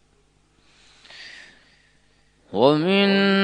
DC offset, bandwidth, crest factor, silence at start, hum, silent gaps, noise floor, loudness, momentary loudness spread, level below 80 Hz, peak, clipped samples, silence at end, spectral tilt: under 0.1%; 9.6 kHz; 22 dB; 1.2 s; 50 Hz at -55 dBFS; none; -61 dBFS; -19 LUFS; 23 LU; -64 dBFS; -2 dBFS; under 0.1%; 0 s; -7 dB/octave